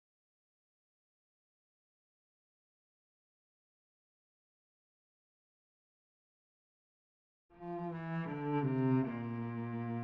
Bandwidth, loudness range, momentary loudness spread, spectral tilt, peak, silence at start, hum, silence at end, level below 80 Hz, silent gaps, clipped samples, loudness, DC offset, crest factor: 5 kHz; 13 LU; 10 LU; -8.5 dB/octave; -22 dBFS; 7.55 s; none; 0 s; -78 dBFS; none; under 0.1%; -37 LUFS; under 0.1%; 22 dB